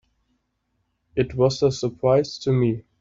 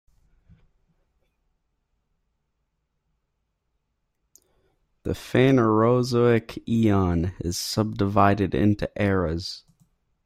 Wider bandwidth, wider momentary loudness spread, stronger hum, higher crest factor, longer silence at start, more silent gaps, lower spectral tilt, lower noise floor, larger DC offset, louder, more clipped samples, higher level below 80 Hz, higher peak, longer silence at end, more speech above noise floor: second, 7.8 kHz vs 16 kHz; second, 6 LU vs 13 LU; neither; about the same, 18 dB vs 20 dB; second, 1.15 s vs 5.05 s; neither; about the same, -6.5 dB/octave vs -6.5 dB/octave; about the same, -73 dBFS vs -76 dBFS; neither; about the same, -22 LUFS vs -22 LUFS; neither; about the same, -50 dBFS vs -50 dBFS; about the same, -6 dBFS vs -4 dBFS; second, 0.2 s vs 0.65 s; about the same, 52 dB vs 55 dB